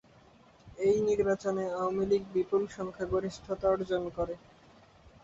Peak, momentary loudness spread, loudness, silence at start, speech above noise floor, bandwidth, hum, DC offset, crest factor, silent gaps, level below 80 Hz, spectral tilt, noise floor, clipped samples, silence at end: -16 dBFS; 9 LU; -31 LUFS; 0.65 s; 29 dB; 7.8 kHz; none; under 0.1%; 16 dB; none; -56 dBFS; -6.5 dB/octave; -59 dBFS; under 0.1%; 0.85 s